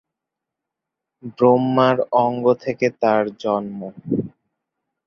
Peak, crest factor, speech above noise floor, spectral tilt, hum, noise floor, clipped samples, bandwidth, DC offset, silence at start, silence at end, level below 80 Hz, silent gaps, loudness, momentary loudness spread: -2 dBFS; 18 dB; 65 dB; -7.5 dB/octave; none; -84 dBFS; under 0.1%; 6.6 kHz; under 0.1%; 1.25 s; 0.8 s; -62 dBFS; none; -19 LUFS; 16 LU